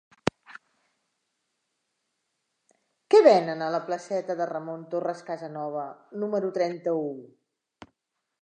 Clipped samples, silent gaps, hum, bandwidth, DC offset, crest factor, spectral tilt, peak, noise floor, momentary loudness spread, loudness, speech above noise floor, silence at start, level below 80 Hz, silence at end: under 0.1%; none; none; 9.2 kHz; under 0.1%; 24 dB; -6 dB/octave; -6 dBFS; -82 dBFS; 17 LU; -26 LUFS; 57 dB; 0.25 s; -70 dBFS; 1.15 s